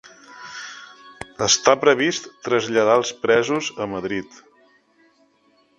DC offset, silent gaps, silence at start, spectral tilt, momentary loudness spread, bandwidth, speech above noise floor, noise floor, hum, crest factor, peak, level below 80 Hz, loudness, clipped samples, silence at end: under 0.1%; none; 0.3 s; -2.5 dB/octave; 21 LU; 10.5 kHz; 41 dB; -60 dBFS; none; 22 dB; 0 dBFS; -60 dBFS; -19 LUFS; under 0.1%; 1.55 s